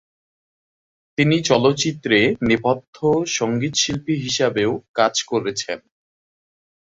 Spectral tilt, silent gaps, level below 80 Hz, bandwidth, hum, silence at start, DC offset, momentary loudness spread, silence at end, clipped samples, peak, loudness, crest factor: -4 dB/octave; 2.88-2.93 s, 4.88-4.94 s; -52 dBFS; 8 kHz; none; 1.2 s; under 0.1%; 7 LU; 1.1 s; under 0.1%; -2 dBFS; -19 LUFS; 20 dB